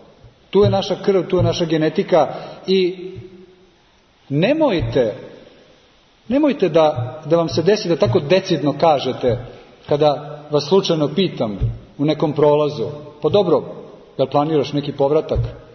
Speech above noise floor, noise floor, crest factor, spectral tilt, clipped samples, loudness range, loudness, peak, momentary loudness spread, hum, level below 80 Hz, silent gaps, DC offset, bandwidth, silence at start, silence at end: 37 dB; -54 dBFS; 16 dB; -7 dB/octave; under 0.1%; 4 LU; -18 LUFS; -2 dBFS; 10 LU; none; -40 dBFS; none; under 0.1%; 6.6 kHz; 0.55 s; 0.1 s